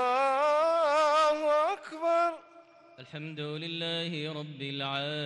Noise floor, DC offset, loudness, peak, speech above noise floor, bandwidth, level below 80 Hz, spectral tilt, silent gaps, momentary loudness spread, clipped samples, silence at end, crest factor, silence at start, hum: -55 dBFS; under 0.1%; -29 LUFS; -18 dBFS; 20 dB; 11.5 kHz; -76 dBFS; -4.5 dB/octave; none; 13 LU; under 0.1%; 0 s; 12 dB; 0 s; none